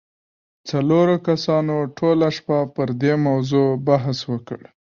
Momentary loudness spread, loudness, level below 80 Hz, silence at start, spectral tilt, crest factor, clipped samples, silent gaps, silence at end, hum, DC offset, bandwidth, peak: 10 LU; -20 LUFS; -60 dBFS; 0.65 s; -7.5 dB/octave; 16 dB; under 0.1%; none; 0.3 s; none; under 0.1%; 7.2 kHz; -4 dBFS